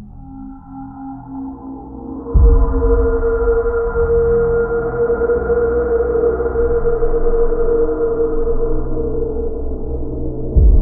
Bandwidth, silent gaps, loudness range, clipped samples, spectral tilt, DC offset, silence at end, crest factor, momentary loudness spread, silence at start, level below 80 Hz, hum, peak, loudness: 2.1 kHz; none; 3 LU; under 0.1%; -14.5 dB/octave; under 0.1%; 0 s; 14 dB; 17 LU; 0 s; -18 dBFS; none; -2 dBFS; -17 LUFS